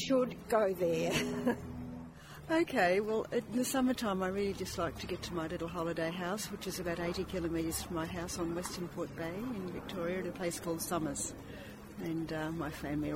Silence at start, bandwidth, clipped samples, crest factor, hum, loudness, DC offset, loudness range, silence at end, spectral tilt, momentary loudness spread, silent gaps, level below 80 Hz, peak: 0 s; 16 kHz; under 0.1%; 18 dB; none; -36 LUFS; under 0.1%; 5 LU; 0 s; -4.5 dB/octave; 9 LU; none; -56 dBFS; -16 dBFS